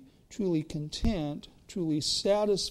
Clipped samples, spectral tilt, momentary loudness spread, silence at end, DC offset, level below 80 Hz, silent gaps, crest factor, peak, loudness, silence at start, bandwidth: under 0.1%; -5 dB/octave; 13 LU; 0 s; under 0.1%; -44 dBFS; none; 14 dB; -16 dBFS; -30 LUFS; 0 s; 15.5 kHz